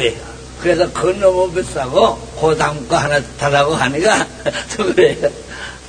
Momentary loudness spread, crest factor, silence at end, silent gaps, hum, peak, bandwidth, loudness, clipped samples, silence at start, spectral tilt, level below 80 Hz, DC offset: 8 LU; 16 dB; 0 s; none; none; 0 dBFS; 9.8 kHz; -16 LUFS; under 0.1%; 0 s; -4.5 dB/octave; -38 dBFS; under 0.1%